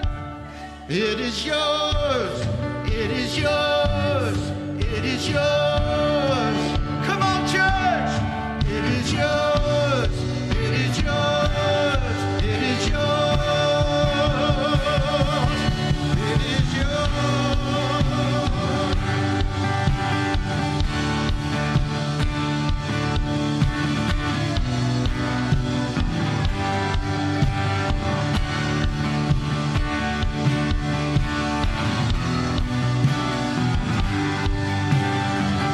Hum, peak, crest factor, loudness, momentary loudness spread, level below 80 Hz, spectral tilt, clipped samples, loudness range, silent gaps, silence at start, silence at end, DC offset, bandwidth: none; -6 dBFS; 16 dB; -22 LUFS; 4 LU; -30 dBFS; -5.5 dB/octave; under 0.1%; 2 LU; none; 0 s; 0 s; under 0.1%; 12.5 kHz